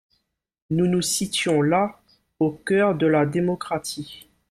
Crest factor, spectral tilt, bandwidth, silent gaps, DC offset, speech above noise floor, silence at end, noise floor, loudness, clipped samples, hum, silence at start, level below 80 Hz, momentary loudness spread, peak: 14 dB; -5 dB/octave; 15.5 kHz; none; under 0.1%; 51 dB; 0.3 s; -72 dBFS; -22 LUFS; under 0.1%; none; 0.7 s; -58 dBFS; 9 LU; -8 dBFS